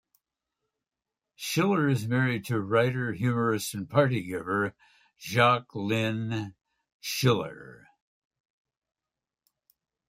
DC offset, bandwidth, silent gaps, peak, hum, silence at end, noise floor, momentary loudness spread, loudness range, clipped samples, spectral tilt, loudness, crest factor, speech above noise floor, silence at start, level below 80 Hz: under 0.1%; 16 kHz; 6.92-7.00 s; -8 dBFS; none; 2.35 s; under -90 dBFS; 11 LU; 7 LU; under 0.1%; -5.5 dB/octave; -27 LUFS; 22 dB; over 63 dB; 1.4 s; -68 dBFS